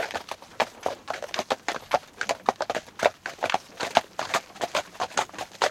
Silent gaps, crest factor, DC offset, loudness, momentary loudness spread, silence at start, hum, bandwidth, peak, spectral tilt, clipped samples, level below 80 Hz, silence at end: none; 28 dB; under 0.1%; -29 LUFS; 6 LU; 0 s; none; 17 kHz; -2 dBFS; -1.5 dB/octave; under 0.1%; -66 dBFS; 0 s